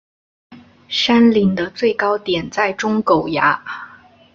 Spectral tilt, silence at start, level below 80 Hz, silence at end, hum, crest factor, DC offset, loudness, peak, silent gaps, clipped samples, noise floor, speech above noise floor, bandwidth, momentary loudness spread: -5.5 dB/octave; 0.5 s; -52 dBFS; 0.5 s; none; 16 dB; under 0.1%; -16 LUFS; -2 dBFS; none; under 0.1%; -44 dBFS; 28 dB; 7.4 kHz; 10 LU